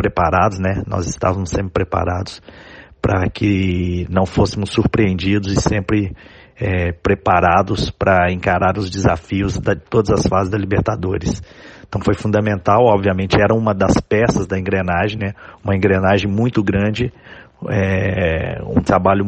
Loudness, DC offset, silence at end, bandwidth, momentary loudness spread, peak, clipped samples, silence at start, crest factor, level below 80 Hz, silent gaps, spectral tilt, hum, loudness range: -17 LUFS; under 0.1%; 0 s; 9.4 kHz; 8 LU; 0 dBFS; under 0.1%; 0 s; 16 dB; -34 dBFS; none; -6.5 dB/octave; none; 3 LU